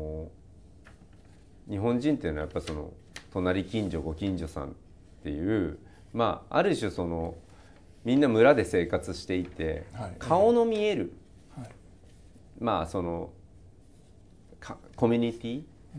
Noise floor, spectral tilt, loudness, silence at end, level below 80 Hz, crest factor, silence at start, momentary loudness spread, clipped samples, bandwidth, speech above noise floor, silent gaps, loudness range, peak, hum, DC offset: -55 dBFS; -6.5 dB/octave; -29 LUFS; 0 s; -50 dBFS; 22 dB; 0 s; 21 LU; under 0.1%; 11 kHz; 28 dB; none; 8 LU; -8 dBFS; none; 0.1%